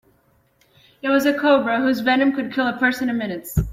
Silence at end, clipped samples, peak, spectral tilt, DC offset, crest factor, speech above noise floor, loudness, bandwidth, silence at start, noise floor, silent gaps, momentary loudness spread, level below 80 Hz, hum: 0 s; under 0.1%; -6 dBFS; -5.5 dB/octave; under 0.1%; 16 dB; 41 dB; -20 LUFS; 16 kHz; 1.05 s; -61 dBFS; none; 7 LU; -38 dBFS; none